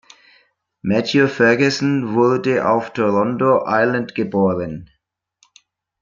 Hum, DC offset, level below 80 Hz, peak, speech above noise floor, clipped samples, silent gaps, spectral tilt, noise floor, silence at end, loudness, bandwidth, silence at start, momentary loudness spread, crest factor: none; under 0.1%; -58 dBFS; -2 dBFS; 46 dB; under 0.1%; none; -6 dB/octave; -63 dBFS; 1.15 s; -17 LUFS; 7.6 kHz; 0.85 s; 7 LU; 16 dB